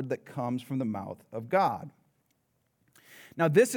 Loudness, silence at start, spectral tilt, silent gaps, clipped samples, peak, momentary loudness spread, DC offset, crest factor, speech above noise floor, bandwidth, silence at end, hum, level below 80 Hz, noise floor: -30 LUFS; 0 s; -6 dB/octave; none; under 0.1%; -10 dBFS; 15 LU; under 0.1%; 20 dB; 46 dB; over 20 kHz; 0 s; none; -80 dBFS; -74 dBFS